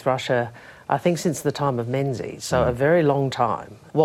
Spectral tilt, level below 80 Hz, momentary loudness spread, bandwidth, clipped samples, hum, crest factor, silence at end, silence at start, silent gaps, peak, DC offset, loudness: -6 dB/octave; -50 dBFS; 10 LU; 16 kHz; under 0.1%; none; 18 dB; 0 s; 0 s; none; -4 dBFS; under 0.1%; -23 LUFS